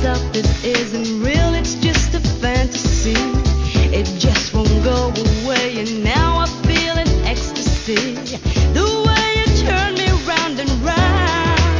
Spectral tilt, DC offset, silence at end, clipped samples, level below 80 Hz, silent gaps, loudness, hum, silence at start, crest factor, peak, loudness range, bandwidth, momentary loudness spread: -5 dB/octave; under 0.1%; 0 s; under 0.1%; -20 dBFS; none; -17 LUFS; none; 0 s; 16 dB; 0 dBFS; 1 LU; 7.6 kHz; 4 LU